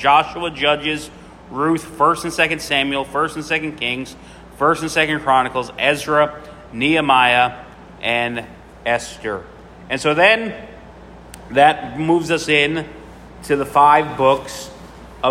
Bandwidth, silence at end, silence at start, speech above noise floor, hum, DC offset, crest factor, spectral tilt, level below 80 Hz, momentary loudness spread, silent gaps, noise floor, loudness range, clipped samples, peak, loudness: 16 kHz; 0 s; 0 s; 22 dB; none; under 0.1%; 18 dB; -4 dB/octave; -46 dBFS; 16 LU; none; -39 dBFS; 3 LU; under 0.1%; 0 dBFS; -17 LUFS